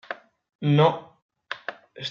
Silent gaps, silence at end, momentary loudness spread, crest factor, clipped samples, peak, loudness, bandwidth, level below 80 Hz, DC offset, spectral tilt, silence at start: 0.55-0.59 s, 1.22-1.29 s; 0 s; 19 LU; 20 dB; under 0.1%; -6 dBFS; -24 LUFS; 6.8 kHz; -72 dBFS; under 0.1%; -5.5 dB/octave; 0.1 s